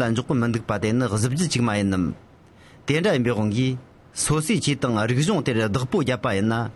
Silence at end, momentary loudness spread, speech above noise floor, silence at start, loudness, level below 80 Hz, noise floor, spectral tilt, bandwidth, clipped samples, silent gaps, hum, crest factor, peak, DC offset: 0.05 s; 5 LU; 27 dB; 0 s; -23 LUFS; -50 dBFS; -49 dBFS; -5.5 dB/octave; 12 kHz; under 0.1%; none; none; 14 dB; -8 dBFS; under 0.1%